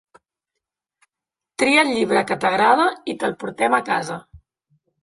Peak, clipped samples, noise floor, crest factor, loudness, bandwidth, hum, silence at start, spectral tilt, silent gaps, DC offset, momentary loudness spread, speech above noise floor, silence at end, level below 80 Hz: -2 dBFS; under 0.1%; -87 dBFS; 20 dB; -19 LUFS; 11.5 kHz; none; 1.6 s; -4 dB/octave; none; under 0.1%; 11 LU; 68 dB; 0.65 s; -60 dBFS